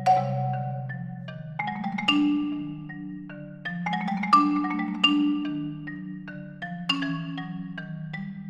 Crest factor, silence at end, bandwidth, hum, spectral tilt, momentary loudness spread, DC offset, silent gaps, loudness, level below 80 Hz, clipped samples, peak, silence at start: 22 dB; 0 s; 9 kHz; none; -6 dB/octave; 16 LU; under 0.1%; none; -27 LUFS; -62 dBFS; under 0.1%; -6 dBFS; 0 s